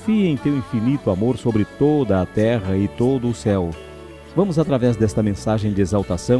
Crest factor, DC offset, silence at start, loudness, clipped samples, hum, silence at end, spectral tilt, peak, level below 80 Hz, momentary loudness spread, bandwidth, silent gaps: 16 dB; under 0.1%; 0 s; -20 LUFS; under 0.1%; none; 0 s; -7.5 dB/octave; -4 dBFS; -42 dBFS; 4 LU; 11 kHz; none